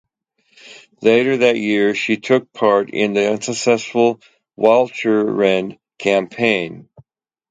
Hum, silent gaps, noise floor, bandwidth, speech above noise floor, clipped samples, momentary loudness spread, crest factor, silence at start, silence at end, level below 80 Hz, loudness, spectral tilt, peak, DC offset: none; none; -63 dBFS; 9.4 kHz; 47 dB; under 0.1%; 6 LU; 18 dB; 0.65 s; 0.7 s; -64 dBFS; -17 LUFS; -4.5 dB/octave; 0 dBFS; under 0.1%